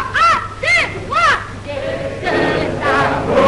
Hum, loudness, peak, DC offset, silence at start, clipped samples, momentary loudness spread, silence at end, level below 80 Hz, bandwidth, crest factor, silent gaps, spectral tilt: none; -15 LUFS; -4 dBFS; under 0.1%; 0 s; under 0.1%; 9 LU; 0 s; -36 dBFS; 11.5 kHz; 12 dB; none; -4.5 dB/octave